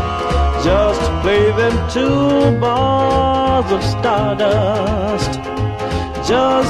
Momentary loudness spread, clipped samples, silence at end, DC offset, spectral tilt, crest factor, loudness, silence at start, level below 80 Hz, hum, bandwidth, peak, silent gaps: 7 LU; under 0.1%; 0 s; under 0.1%; -6 dB/octave; 14 dB; -15 LUFS; 0 s; -26 dBFS; none; 12.5 kHz; -2 dBFS; none